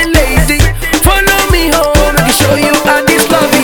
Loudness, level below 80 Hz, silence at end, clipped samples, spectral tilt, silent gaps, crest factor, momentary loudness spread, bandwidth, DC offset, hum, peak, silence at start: -8 LUFS; -16 dBFS; 0 s; 1%; -4 dB/octave; none; 8 dB; 2 LU; over 20 kHz; under 0.1%; none; 0 dBFS; 0 s